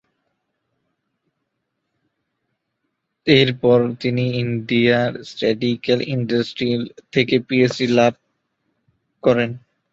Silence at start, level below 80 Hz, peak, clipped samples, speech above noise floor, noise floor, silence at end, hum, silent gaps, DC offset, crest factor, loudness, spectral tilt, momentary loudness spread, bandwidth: 3.25 s; -56 dBFS; -2 dBFS; under 0.1%; 58 dB; -76 dBFS; 0.35 s; none; none; under 0.1%; 20 dB; -19 LUFS; -6.5 dB/octave; 8 LU; 7.8 kHz